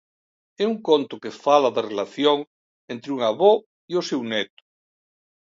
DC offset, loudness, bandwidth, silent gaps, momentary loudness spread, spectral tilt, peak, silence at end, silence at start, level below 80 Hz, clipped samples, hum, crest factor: under 0.1%; -22 LUFS; 7.6 kHz; 2.47-2.88 s, 3.66-3.88 s; 14 LU; -4.5 dB/octave; -2 dBFS; 1.1 s; 0.6 s; -76 dBFS; under 0.1%; none; 20 dB